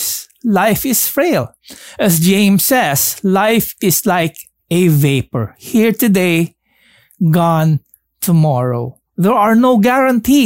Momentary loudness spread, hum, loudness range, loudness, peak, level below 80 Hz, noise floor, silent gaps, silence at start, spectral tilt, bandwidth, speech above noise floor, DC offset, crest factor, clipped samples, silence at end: 10 LU; none; 2 LU; -13 LUFS; -2 dBFS; -48 dBFS; -52 dBFS; none; 0 s; -5 dB/octave; 16.5 kHz; 40 dB; 0.1%; 12 dB; under 0.1%; 0 s